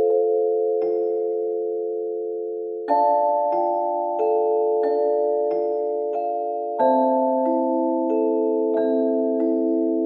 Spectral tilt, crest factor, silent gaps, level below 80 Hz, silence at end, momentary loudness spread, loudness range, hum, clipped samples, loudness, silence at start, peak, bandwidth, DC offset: -9 dB/octave; 14 dB; none; -84 dBFS; 0 s; 7 LU; 2 LU; none; under 0.1%; -22 LUFS; 0 s; -8 dBFS; 4.6 kHz; under 0.1%